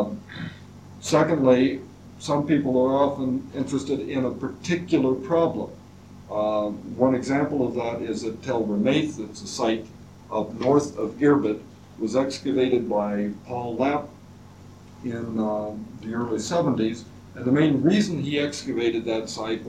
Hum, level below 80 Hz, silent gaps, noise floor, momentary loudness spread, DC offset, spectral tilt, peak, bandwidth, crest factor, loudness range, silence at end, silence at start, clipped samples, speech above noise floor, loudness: none; -58 dBFS; none; -46 dBFS; 14 LU; under 0.1%; -6 dB/octave; -6 dBFS; 11.5 kHz; 18 dB; 5 LU; 0 s; 0 s; under 0.1%; 22 dB; -24 LUFS